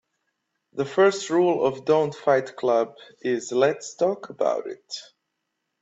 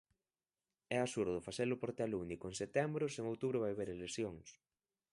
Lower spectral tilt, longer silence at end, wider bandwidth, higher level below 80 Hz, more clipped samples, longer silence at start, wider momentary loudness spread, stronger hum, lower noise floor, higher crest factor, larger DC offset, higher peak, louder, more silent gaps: about the same, -5 dB/octave vs -5.5 dB/octave; first, 0.8 s vs 0.55 s; second, 8 kHz vs 11.5 kHz; about the same, -72 dBFS vs -68 dBFS; neither; second, 0.75 s vs 0.9 s; first, 13 LU vs 6 LU; neither; second, -79 dBFS vs under -90 dBFS; about the same, 18 dB vs 20 dB; neither; first, -8 dBFS vs -20 dBFS; first, -23 LUFS vs -41 LUFS; neither